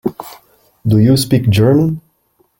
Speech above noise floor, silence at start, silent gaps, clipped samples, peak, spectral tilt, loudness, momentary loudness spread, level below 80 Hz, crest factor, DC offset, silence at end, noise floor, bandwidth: 48 dB; 0.05 s; none; under 0.1%; -2 dBFS; -7 dB/octave; -13 LUFS; 18 LU; -42 dBFS; 12 dB; under 0.1%; 0.6 s; -59 dBFS; 17 kHz